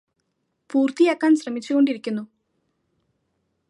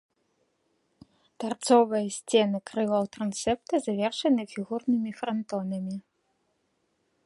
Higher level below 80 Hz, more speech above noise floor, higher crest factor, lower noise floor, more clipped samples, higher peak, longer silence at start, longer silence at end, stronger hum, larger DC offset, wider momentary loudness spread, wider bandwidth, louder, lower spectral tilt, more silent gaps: second, -80 dBFS vs -66 dBFS; first, 54 dB vs 47 dB; about the same, 18 dB vs 20 dB; about the same, -74 dBFS vs -74 dBFS; neither; about the same, -6 dBFS vs -8 dBFS; second, 0.75 s vs 1.4 s; first, 1.45 s vs 1.25 s; neither; neither; about the same, 10 LU vs 12 LU; about the same, 11 kHz vs 11.5 kHz; first, -21 LUFS vs -28 LUFS; about the same, -5 dB/octave vs -5 dB/octave; neither